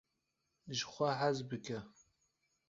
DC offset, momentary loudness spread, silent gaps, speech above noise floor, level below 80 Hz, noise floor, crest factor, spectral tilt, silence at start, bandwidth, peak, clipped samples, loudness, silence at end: under 0.1%; 12 LU; none; 47 dB; -76 dBFS; -85 dBFS; 22 dB; -4 dB/octave; 0.65 s; 7.6 kHz; -20 dBFS; under 0.1%; -39 LUFS; 0.8 s